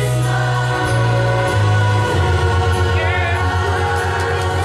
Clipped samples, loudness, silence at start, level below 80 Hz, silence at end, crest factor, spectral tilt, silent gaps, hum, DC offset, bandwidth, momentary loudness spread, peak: under 0.1%; -16 LUFS; 0 s; -30 dBFS; 0 s; 12 dB; -5.5 dB/octave; none; none; under 0.1%; 13 kHz; 2 LU; -4 dBFS